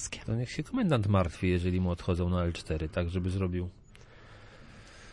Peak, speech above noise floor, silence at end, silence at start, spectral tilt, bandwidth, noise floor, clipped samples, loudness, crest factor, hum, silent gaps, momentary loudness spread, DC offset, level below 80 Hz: -14 dBFS; 23 dB; 0 s; 0 s; -6.5 dB/octave; 11 kHz; -53 dBFS; under 0.1%; -31 LUFS; 18 dB; none; none; 10 LU; under 0.1%; -50 dBFS